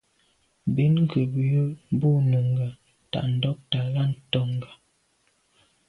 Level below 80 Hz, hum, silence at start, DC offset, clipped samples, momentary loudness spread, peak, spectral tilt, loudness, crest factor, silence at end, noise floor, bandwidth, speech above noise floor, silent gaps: -60 dBFS; none; 0.65 s; under 0.1%; under 0.1%; 11 LU; -8 dBFS; -9 dB/octave; -25 LUFS; 16 dB; 1.2 s; -68 dBFS; 4.4 kHz; 44 dB; none